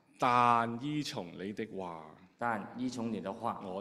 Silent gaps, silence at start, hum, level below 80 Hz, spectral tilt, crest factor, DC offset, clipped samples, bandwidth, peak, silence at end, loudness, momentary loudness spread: none; 0.2 s; none; -72 dBFS; -5.5 dB/octave; 22 dB; under 0.1%; under 0.1%; 13.5 kHz; -12 dBFS; 0 s; -34 LUFS; 14 LU